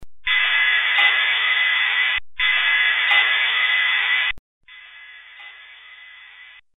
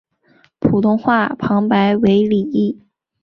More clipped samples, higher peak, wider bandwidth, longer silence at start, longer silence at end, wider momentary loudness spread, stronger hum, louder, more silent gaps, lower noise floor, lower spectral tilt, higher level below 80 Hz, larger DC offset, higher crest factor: neither; second, -6 dBFS vs -2 dBFS; second, 4.1 kHz vs 5.8 kHz; second, 0 s vs 0.6 s; second, 0.35 s vs 0.5 s; about the same, 5 LU vs 7 LU; neither; about the same, -16 LUFS vs -16 LUFS; first, 4.39-4.61 s vs none; second, -45 dBFS vs -55 dBFS; second, 0 dB/octave vs -9 dB/octave; second, -54 dBFS vs -48 dBFS; neither; about the same, 16 dB vs 14 dB